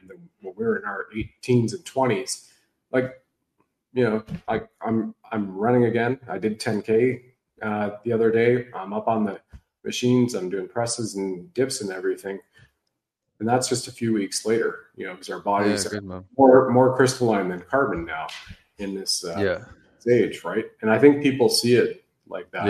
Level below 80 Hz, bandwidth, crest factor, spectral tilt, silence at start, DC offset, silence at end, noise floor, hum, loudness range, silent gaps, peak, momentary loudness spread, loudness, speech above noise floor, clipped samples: -58 dBFS; 13 kHz; 22 dB; -5 dB/octave; 0.1 s; under 0.1%; 0 s; -79 dBFS; none; 7 LU; none; -2 dBFS; 15 LU; -23 LUFS; 57 dB; under 0.1%